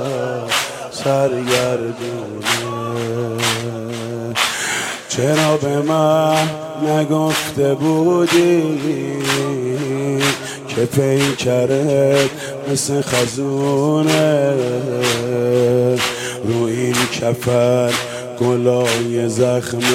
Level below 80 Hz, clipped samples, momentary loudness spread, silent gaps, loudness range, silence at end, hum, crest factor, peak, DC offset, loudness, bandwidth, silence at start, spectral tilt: -56 dBFS; under 0.1%; 8 LU; none; 3 LU; 0 s; none; 16 dB; -2 dBFS; under 0.1%; -17 LUFS; 16.5 kHz; 0 s; -4.5 dB/octave